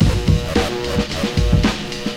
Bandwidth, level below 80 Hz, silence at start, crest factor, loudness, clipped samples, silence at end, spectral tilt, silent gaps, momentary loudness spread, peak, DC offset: 16 kHz; -24 dBFS; 0 s; 14 dB; -19 LUFS; under 0.1%; 0 s; -5.5 dB/octave; none; 5 LU; -2 dBFS; under 0.1%